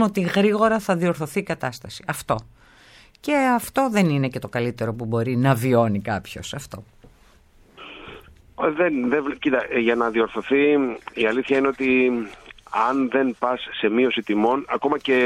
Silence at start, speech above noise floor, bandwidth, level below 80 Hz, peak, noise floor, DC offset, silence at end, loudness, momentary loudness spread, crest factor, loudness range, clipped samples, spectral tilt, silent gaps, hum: 0 s; 32 dB; 16.5 kHz; -54 dBFS; -4 dBFS; -53 dBFS; under 0.1%; 0 s; -22 LUFS; 13 LU; 18 dB; 5 LU; under 0.1%; -6 dB/octave; none; none